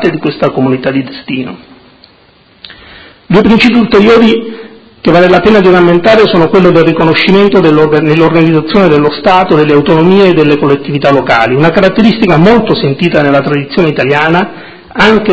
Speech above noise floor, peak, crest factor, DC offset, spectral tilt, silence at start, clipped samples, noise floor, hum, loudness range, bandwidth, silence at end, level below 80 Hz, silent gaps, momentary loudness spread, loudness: 37 dB; 0 dBFS; 6 dB; under 0.1%; -7.5 dB/octave; 0 s; 4%; -43 dBFS; none; 4 LU; 8 kHz; 0 s; -36 dBFS; none; 7 LU; -7 LUFS